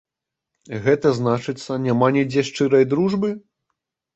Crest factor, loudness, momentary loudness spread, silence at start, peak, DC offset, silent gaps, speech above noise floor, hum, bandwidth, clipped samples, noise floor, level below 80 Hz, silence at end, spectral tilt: 18 dB; -20 LUFS; 9 LU; 0.7 s; -2 dBFS; under 0.1%; none; 64 dB; none; 8.2 kHz; under 0.1%; -83 dBFS; -60 dBFS; 0.75 s; -6.5 dB/octave